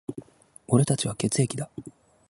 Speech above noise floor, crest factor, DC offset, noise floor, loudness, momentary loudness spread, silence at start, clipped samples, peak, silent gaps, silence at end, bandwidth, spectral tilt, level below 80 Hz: 26 dB; 20 dB; under 0.1%; -51 dBFS; -25 LUFS; 19 LU; 0.1 s; under 0.1%; -6 dBFS; none; 0.4 s; 11.5 kHz; -5.5 dB/octave; -58 dBFS